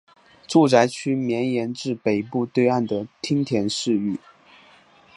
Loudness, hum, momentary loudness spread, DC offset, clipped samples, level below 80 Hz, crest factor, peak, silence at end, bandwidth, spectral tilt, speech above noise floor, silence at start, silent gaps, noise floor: -22 LUFS; none; 10 LU; under 0.1%; under 0.1%; -64 dBFS; 22 dB; -2 dBFS; 1 s; 11.5 kHz; -5.5 dB/octave; 32 dB; 0.5 s; none; -53 dBFS